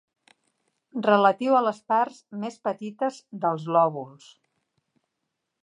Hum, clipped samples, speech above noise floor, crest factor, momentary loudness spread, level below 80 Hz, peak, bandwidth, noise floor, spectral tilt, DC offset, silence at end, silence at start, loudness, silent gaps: none; under 0.1%; 57 dB; 20 dB; 15 LU; -84 dBFS; -6 dBFS; 10.5 kHz; -81 dBFS; -6.5 dB/octave; under 0.1%; 1.55 s; 0.95 s; -24 LUFS; none